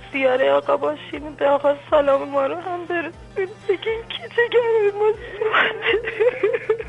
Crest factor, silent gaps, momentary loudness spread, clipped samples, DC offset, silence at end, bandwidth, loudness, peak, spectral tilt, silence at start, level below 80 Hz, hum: 16 dB; none; 10 LU; under 0.1%; under 0.1%; 0 s; 9 kHz; -21 LUFS; -6 dBFS; -5.5 dB/octave; 0 s; -50 dBFS; none